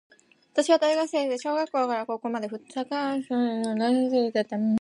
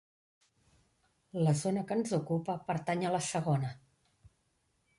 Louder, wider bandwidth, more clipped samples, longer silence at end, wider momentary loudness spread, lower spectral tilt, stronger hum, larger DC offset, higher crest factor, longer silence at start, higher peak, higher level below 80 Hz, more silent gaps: first, -26 LUFS vs -33 LUFS; about the same, 11.5 kHz vs 11.5 kHz; neither; second, 0.05 s vs 1.2 s; first, 9 LU vs 5 LU; about the same, -5 dB/octave vs -6 dB/octave; neither; neither; about the same, 16 dB vs 18 dB; second, 0.55 s vs 1.35 s; first, -10 dBFS vs -18 dBFS; about the same, -74 dBFS vs -70 dBFS; neither